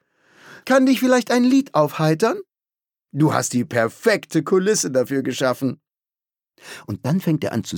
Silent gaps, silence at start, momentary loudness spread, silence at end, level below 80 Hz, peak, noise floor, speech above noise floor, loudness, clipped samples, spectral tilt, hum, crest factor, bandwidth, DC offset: none; 0.5 s; 14 LU; 0 s; -66 dBFS; -2 dBFS; under -90 dBFS; over 71 dB; -19 LUFS; under 0.1%; -5 dB/octave; none; 18 dB; 19 kHz; under 0.1%